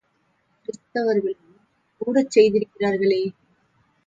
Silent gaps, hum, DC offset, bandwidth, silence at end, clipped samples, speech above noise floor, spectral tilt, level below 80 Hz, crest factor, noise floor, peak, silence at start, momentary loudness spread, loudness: none; none; under 0.1%; 7.8 kHz; 0.75 s; under 0.1%; 48 dB; -5.5 dB/octave; -64 dBFS; 20 dB; -67 dBFS; -4 dBFS; 0.7 s; 20 LU; -21 LUFS